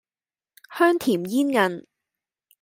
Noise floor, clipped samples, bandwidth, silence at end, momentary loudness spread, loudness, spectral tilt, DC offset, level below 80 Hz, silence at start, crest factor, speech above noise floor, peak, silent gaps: under -90 dBFS; under 0.1%; 16.5 kHz; 0.8 s; 14 LU; -22 LUFS; -5 dB/octave; under 0.1%; -72 dBFS; 0.7 s; 20 dB; over 69 dB; -6 dBFS; none